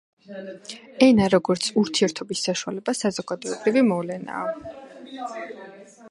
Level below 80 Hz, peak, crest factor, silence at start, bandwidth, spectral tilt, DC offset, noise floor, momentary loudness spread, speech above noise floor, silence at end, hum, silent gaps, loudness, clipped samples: -60 dBFS; -2 dBFS; 22 dB; 0.3 s; 11.5 kHz; -4.5 dB/octave; under 0.1%; -44 dBFS; 21 LU; 21 dB; 0 s; none; none; -23 LUFS; under 0.1%